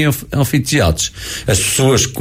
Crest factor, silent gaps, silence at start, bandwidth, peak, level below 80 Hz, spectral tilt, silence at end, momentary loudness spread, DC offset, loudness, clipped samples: 12 dB; none; 0 s; 16 kHz; -2 dBFS; -30 dBFS; -4 dB/octave; 0 s; 7 LU; under 0.1%; -14 LUFS; under 0.1%